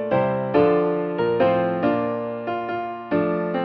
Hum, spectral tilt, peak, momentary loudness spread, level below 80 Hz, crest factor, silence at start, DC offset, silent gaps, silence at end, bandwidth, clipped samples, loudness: none; -10 dB/octave; -6 dBFS; 8 LU; -56 dBFS; 16 dB; 0 s; under 0.1%; none; 0 s; 5.6 kHz; under 0.1%; -22 LUFS